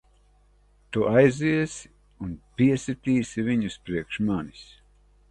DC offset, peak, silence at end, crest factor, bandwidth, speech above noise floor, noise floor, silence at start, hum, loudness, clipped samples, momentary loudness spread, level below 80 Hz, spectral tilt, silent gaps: under 0.1%; -6 dBFS; 0.65 s; 20 dB; 11 kHz; 35 dB; -60 dBFS; 0.9 s; 50 Hz at -55 dBFS; -25 LUFS; under 0.1%; 18 LU; -52 dBFS; -6.5 dB/octave; none